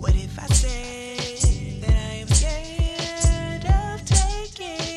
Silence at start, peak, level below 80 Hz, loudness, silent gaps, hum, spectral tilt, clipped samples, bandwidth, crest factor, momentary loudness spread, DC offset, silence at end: 0 s; -6 dBFS; -24 dBFS; -23 LUFS; none; none; -4 dB/octave; under 0.1%; 12.5 kHz; 16 dB; 9 LU; under 0.1%; 0 s